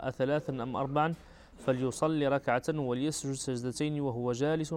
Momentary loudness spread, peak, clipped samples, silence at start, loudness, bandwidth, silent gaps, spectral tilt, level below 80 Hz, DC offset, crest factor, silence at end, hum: 5 LU; -16 dBFS; under 0.1%; 0 s; -32 LUFS; 16 kHz; none; -5.5 dB/octave; -60 dBFS; under 0.1%; 16 dB; 0 s; none